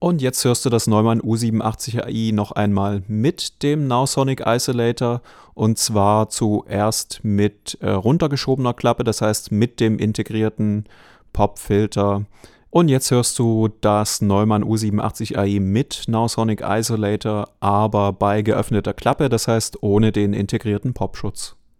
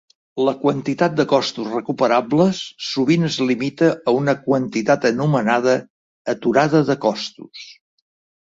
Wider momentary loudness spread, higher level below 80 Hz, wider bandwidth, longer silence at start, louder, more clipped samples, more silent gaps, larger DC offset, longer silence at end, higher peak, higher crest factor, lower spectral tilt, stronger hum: second, 6 LU vs 10 LU; first, -44 dBFS vs -62 dBFS; first, 16.5 kHz vs 7.8 kHz; second, 0 s vs 0.35 s; about the same, -19 LUFS vs -19 LUFS; neither; second, none vs 5.90-6.25 s; neither; second, 0.25 s vs 0.75 s; about the same, -2 dBFS vs -2 dBFS; about the same, 18 dB vs 16 dB; about the same, -5.5 dB/octave vs -6 dB/octave; neither